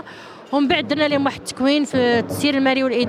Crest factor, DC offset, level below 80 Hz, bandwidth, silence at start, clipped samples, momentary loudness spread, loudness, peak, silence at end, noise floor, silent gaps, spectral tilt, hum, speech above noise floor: 14 dB; under 0.1%; -56 dBFS; 15 kHz; 0.05 s; under 0.1%; 6 LU; -19 LUFS; -6 dBFS; 0 s; -39 dBFS; none; -4.5 dB/octave; none; 20 dB